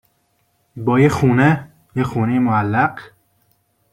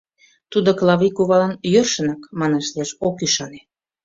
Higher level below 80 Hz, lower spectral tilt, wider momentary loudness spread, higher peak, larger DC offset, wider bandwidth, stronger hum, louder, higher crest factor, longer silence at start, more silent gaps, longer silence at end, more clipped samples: first, -50 dBFS vs -58 dBFS; first, -8 dB/octave vs -4.5 dB/octave; about the same, 10 LU vs 8 LU; about the same, -2 dBFS vs -2 dBFS; neither; first, 14 kHz vs 7.8 kHz; neither; about the same, -17 LUFS vs -19 LUFS; about the same, 16 dB vs 16 dB; first, 0.75 s vs 0.5 s; neither; first, 0.85 s vs 0.45 s; neither